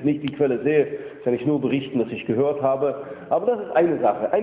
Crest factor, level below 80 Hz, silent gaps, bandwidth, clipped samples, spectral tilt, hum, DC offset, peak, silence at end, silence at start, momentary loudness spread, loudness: 16 dB; -60 dBFS; none; 4 kHz; under 0.1%; -11 dB/octave; none; under 0.1%; -6 dBFS; 0 s; 0 s; 5 LU; -22 LUFS